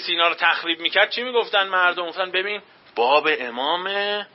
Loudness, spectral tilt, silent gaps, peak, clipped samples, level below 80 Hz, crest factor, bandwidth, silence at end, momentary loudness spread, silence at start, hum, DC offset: -20 LUFS; -6 dB/octave; none; -4 dBFS; under 0.1%; -76 dBFS; 18 dB; 5.8 kHz; 0.1 s; 6 LU; 0 s; none; under 0.1%